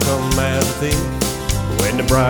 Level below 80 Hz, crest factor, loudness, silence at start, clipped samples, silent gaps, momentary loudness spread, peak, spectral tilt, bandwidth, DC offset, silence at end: -26 dBFS; 16 dB; -18 LUFS; 0 s; under 0.1%; none; 4 LU; 0 dBFS; -4.5 dB/octave; over 20 kHz; under 0.1%; 0 s